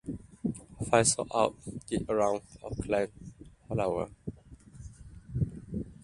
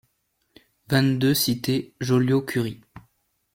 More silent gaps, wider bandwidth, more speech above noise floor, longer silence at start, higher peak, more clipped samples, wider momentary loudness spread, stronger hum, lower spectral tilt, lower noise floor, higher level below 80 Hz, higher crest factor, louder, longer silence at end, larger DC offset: neither; second, 11.5 kHz vs 16.5 kHz; second, 22 dB vs 50 dB; second, 0.05 s vs 0.9 s; about the same, -8 dBFS vs -6 dBFS; neither; first, 23 LU vs 7 LU; neither; about the same, -4.5 dB/octave vs -5.5 dB/octave; second, -52 dBFS vs -72 dBFS; first, -50 dBFS vs -56 dBFS; first, 24 dB vs 18 dB; second, -31 LUFS vs -23 LUFS; second, 0 s vs 0.55 s; neither